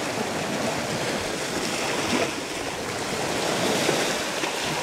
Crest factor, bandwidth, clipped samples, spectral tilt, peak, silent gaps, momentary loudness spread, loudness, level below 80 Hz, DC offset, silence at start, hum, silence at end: 18 dB; 16 kHz; under 0.1%; -3 dB/octave; -8 dBFS; none; 6 LU; -25 LUFS; -54 dBFS; under 0.1%; 0 s; none; 0 s